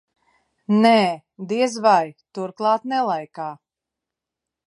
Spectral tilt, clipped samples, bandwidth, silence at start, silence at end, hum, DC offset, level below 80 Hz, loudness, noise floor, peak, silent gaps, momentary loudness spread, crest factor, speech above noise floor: -5.5 dB/octave; under 0.1%; 11.5 kHz; 0.7 s; 1.1 s; none; under 0.1%; -76 dBFS; -20 LUFS; -86 dBFS; -2 dBFS; none; 17 LU; 20 dB; 66 dB